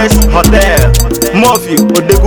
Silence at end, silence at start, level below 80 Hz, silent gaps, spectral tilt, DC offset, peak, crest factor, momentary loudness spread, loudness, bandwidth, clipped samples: 0 s; 0 s; -12 dBFS; none; -4.5 dB/octave; under 0.1%; 0 dBFS; 6 dB; 3 LU; -8 LUFS; over 20 kHz; 3%